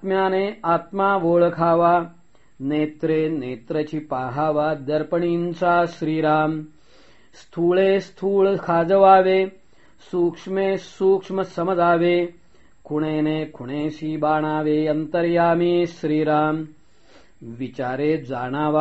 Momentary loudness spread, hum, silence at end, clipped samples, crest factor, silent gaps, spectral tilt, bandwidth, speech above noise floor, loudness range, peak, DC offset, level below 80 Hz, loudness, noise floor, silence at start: 10 LU; none; 0 s; under 0.1%; 20 dB; none; -5.5 dB/octave; 8 kHz; 34 dB; 4 LU; -2 dBFS; 0.3%; -58 dBFS; -21 LUFS; -54 dBFS; 0 s